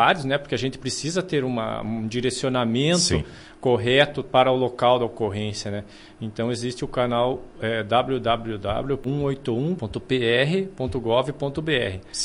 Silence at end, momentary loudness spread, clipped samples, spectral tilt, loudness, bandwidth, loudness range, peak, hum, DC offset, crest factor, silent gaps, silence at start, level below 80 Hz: 0 s; 9 LU; under 0.1%; -4.5 dB/octave; -23 LUFS; 11.5 kHz; 4 LU; -4 dBFS; none; under 0.1%; 20 dB; none; 0 s; -46 dBFS